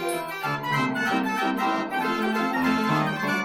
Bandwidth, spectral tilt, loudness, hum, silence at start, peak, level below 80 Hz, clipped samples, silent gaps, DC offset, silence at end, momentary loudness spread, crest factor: 17 kHz; -5 dB/octave; -25 LUFS; none; 0 s; -10 dBFS; -62 dBFS; under 0.1%; none; under 0.1%; 0 s; 5 LU; 16 dB